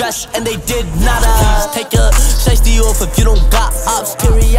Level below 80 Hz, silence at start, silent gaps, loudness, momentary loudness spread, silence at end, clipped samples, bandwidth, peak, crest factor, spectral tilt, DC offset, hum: -12 dBFS; 0 s; none; -13 LUFS; 6 LU; 0 s; under 0.1%; 16.5 kHz; 0 dBFS; 10 dB; -4 dB/octave; under 0.1%; none